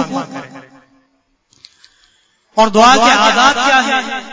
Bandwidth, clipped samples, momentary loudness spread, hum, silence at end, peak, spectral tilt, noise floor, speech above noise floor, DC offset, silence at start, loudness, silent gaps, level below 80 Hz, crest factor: 8 kHz; under 0.1%; 15 LU; none; 0 s; 0 dBFS; -2.5 dB/octave; -60 dBFS; 50 dB; under 0.1%; 0 s; -10 LUFS; none; -50 dBFS; 14 dB